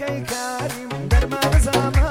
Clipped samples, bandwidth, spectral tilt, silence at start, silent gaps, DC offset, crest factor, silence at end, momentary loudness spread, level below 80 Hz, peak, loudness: under 0.1%; 16.5 kHz; -5 dB/octave; 0 s; none; under 0.1%; 14 dB; 0 s; 9 LU; -22 dBFS; -4 dBFS; -21 LUFS